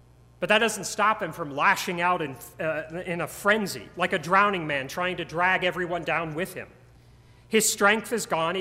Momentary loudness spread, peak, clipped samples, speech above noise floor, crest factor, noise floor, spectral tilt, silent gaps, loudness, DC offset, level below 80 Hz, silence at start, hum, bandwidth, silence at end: 11 LU; -6 dBFS; under 0.1%; 28 dB; 20 dB; -53 dBFS; -3 dB/octave; none; -25 LUFS; under 0.1%; -58 dBFS; 0.4 s; none; 16 kHz; 0 s